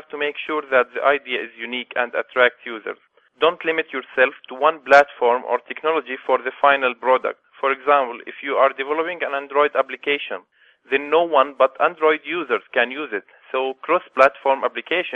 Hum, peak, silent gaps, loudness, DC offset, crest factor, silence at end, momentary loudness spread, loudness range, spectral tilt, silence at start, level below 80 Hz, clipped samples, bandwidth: none; 0 dBFS; none; -20 LUFS; under 0.1%; 20 dB; 0 s; 11 LU; 3 LU; -4 dB/octave; 0.15 s; -68 dBFS; under 0.1%; 7.8 kHz